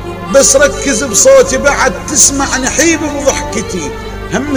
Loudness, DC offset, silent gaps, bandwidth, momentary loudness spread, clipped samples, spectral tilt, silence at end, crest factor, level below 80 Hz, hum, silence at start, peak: -9 LUFS; 0.2%; none; over 20 kHz; 12 LU; 1%; -2.5 dB/octave; 0 s; 10 dB; -28 dBFS; none; 0 s; 0 dBFS